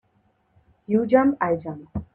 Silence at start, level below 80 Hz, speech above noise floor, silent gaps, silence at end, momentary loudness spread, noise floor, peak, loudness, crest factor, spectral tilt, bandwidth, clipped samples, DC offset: 0.9 s; -52 dBFS; 44 dB; none; 0.1 s; 14 LU; -66 dBFS; -4 dBFS; -22 LUFS; 20 dB; -10.5 dB/octave; 4.3 kHz; under 0.1%; under 0.1%